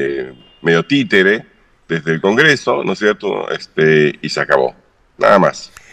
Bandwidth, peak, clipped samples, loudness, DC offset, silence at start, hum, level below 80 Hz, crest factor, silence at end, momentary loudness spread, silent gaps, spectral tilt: 9.8 kHz; 0 dBFS; under 0.1%; -14 LUFS; under 0.1%; 0 s; none; -54 dBFS; 14 dB; 0.25 s; 10 LU; none; -5 dB/octave